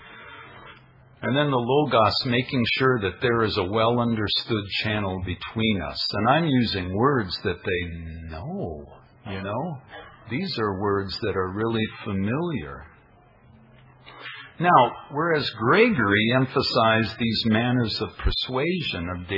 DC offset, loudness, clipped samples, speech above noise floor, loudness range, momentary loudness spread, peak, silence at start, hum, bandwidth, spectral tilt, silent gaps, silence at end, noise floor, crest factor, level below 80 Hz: under 0.1%; -23 LUFS; under 0.1%; 31 dB; 9 LU; 17 LU; -2 dBFS; 0 s; none; 5.8 kHz; -7.5 dB/octave; none; 0 s; -54 dBFS; 22 dB; -44 dBFS